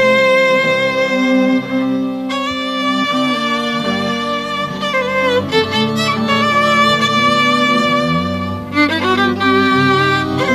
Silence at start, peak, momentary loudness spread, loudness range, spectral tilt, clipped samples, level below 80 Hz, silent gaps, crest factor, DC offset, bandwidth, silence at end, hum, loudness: 0 s; 0 dBFS; 7 LU; 4 LU; -5 dB/octave; under 0.1%; -48 dBFS; none; 14 dB; under 0.1%; 15 kHz; 0 s; none; -14 LUFS